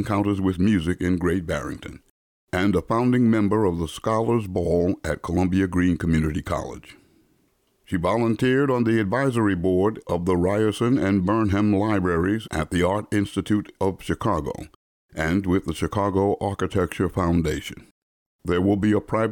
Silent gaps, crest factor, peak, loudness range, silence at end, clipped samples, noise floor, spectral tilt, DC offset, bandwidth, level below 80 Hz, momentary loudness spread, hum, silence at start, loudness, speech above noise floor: 2.10-2.47 s, 14.76-15.09 s, 17.91-18.39 s; 12 dB; -10 dBFS; 3 LU; 0 s; under 0.1%; -66 dBFS; -7 dB/octave; under 0.1%; 18 kHz; -42 dBFS; 8 LU; none; 0 s; -23 LUFS; 44 dB